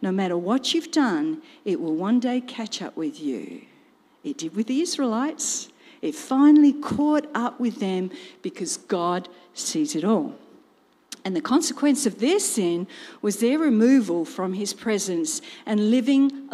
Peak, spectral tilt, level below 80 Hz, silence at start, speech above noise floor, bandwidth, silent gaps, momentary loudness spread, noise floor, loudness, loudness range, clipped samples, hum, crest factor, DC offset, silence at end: -8 dBFS; -4 dB/octave; -70 dBFS; 0 s; 37 dB; 14.5 kHz; none; 13 LU; -60 dBFS; -23 LUFS; 6 LU; under 0.1%; none; 16 dB; under 0.1%; 0 s